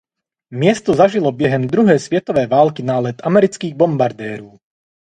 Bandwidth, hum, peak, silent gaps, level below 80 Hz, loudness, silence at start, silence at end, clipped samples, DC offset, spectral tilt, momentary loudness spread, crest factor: 10.5 kHz; none; 0 dBFS; none; -54 dBFS; -15 LUFS; 0.5 s; 0.65 s; under 0.1%; under 0.1%; -7 dB/octave; 6 LU; 16 dB